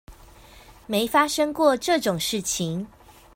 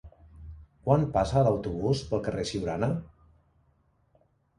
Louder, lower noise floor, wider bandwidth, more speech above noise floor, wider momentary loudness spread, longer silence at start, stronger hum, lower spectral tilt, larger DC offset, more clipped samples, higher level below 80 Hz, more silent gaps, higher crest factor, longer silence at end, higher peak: first, -23 LUFS vs -28 LUFS; second, -49 dBFS vs -68 dBFS; first, 16.5 kHz vs 11 kHz; second, 26 dB vs 41 dB; second, 9 LU vs 24 LU; about the same, 0.1 s vs 0.05 s; neither; second, -3.5 dB/octave vs -7 dB/octave; neither; neither; second, -54 dBFS vs -48 dBFS; neither; about the same, 20 dB vs 22 dB; second, 0.5 s vs 1.5 s; about the same, -6 dBFS vs -8 dBFS